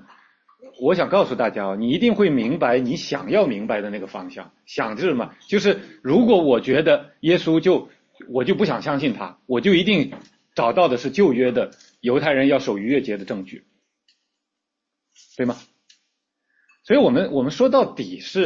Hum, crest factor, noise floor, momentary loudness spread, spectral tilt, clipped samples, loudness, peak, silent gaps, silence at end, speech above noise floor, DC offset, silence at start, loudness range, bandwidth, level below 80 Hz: none; 18 dB; -81 dBFS; 12 LU; -6.5 dB/octave; under 0.1%; -20 LUFS; -4 dBFS; none; 0 s; 62 dB; under 0.1%; 0.65 s; 7 LU; 7.4 kHz; -60 dBFS